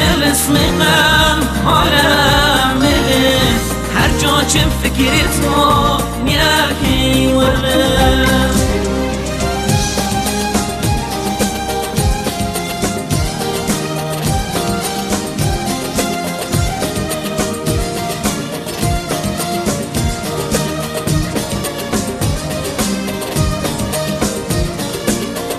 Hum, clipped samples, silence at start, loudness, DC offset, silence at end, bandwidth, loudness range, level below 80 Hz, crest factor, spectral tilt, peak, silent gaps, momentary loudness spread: none; under 0.1%; 0 s; -15 LUFS; under 0.1%; 0 s; 15 kHz; 6 LU; -24 dBFS; 14 dB; -4 dB/octave; 0 dBFS; none; 8 LU